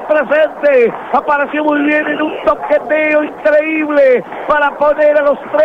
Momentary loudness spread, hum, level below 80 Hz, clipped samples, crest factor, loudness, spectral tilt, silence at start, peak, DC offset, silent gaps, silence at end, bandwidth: 4 LU; none; -50 dBFS; under 0.1%; 10 dB; -12 LUFS; -6 dB/octave; 0 s; -2 dBFS; under 0.1%; none; 0 s; 5.6 kHz